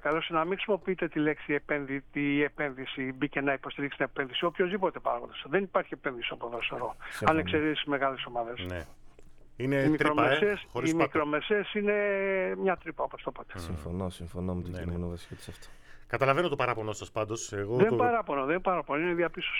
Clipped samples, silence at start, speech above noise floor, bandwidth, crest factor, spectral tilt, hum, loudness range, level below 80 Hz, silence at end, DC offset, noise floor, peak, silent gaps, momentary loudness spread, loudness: under 0.1%; 0 s; 20 dB; 14.5 kHz; 22 dB; -5.5 dB/octave; none; 5 LU; -54 dBFS; 0 s; under 0.1%; -50 dBFS; -8 dBFS; none; 11 LU; -30 LUFS